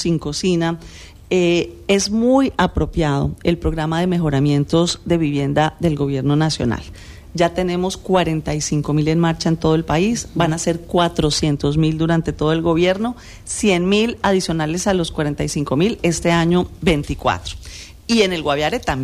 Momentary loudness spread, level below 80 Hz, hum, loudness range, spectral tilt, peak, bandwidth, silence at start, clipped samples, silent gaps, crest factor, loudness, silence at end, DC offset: 6 LU; -36 dBFS; none; 2 LU; -5.5 dB/octave; -4 dBFS; 14 kHz; 0 s; under 0.1%; none; 14 dB; -18 LUFS; 0 s; under 0.1%